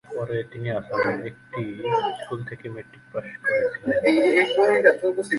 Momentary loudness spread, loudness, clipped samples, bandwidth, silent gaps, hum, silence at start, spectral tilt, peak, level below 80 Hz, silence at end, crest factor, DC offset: 16 LU; -23 LUFS; under 0.1%; 11.5 kHz; none; none; 0.1 s; -6 dB/octave; -2 dBFS; -62 dBFS; 0 s; 20 dB; under 0.1%